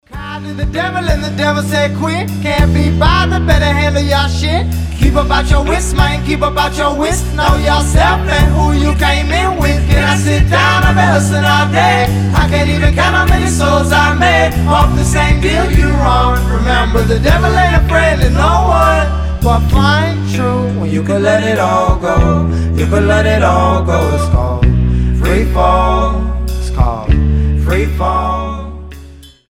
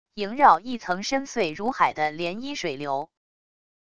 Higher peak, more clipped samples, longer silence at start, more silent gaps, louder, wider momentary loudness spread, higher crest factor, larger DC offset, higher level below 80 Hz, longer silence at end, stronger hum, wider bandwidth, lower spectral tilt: first, 0 dBFS vs -4 dBFS; neither; about the same, 0.1 s vs 0.05 s; neither; first, -12 LUFS vs -24 LUFS; second, 5 LU vs 12 LU; second, 10 dB vs 22 dB; second, under 0.1% vs 0.5%; first, -16 dBFS vs -62 dBFS; second, 0.25 s vs 0.65 s; neither; first, 16 kHz vs 10.5 kHz; first, -5.5 dB/octave vs -4 dB/octave